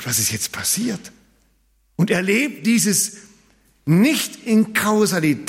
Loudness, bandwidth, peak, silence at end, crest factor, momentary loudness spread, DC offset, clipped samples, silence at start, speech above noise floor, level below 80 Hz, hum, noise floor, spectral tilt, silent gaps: -18 LUFS; 16.5 kHz; -6 dBFS; 0 s; 14 dB; 8 LU; under 0.1%; under 0.1%; 0 s; 42 dB; -60 dBFS; none; -61 dBFS; -4 dB/octave; none